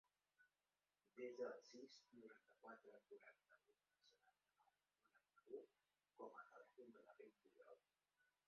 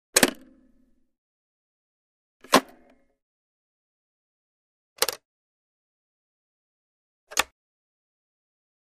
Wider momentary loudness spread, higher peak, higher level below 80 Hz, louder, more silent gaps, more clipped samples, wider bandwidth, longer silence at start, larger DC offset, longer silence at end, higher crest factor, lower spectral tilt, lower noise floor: about the same, 13 LU vs 11 LU; second, -40 dBFS vs -2 dBFS; second, under -90 dBFS vs -62 dBFS; second, -61 LUFS vs -24 LUFS; second, none vs 1.18-2.40 s, 3.22-4.96 s, 5.25-7.27 s; neither; second, 6.8 kHz vs 15.5 kHz; first, 0.4 s vs 0.15 s; neither; second, 0.2 s vs 1.4 s; second, 24 dB vs 30 dB; first, -2.5 dB/octave vs -1 dB/octave; first, under -90 dBFS vs -63 dBFS